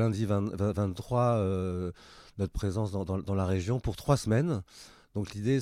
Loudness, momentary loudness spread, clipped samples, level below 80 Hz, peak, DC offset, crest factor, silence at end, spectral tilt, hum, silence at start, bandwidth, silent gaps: -31 LUFS; 12 LU; under 0.1%; -48 dBFS; -12 dBFS; under 0.1%; 18 dB; 0 s; -7.5 dB/octave; none; 0 s; 15 kHz; none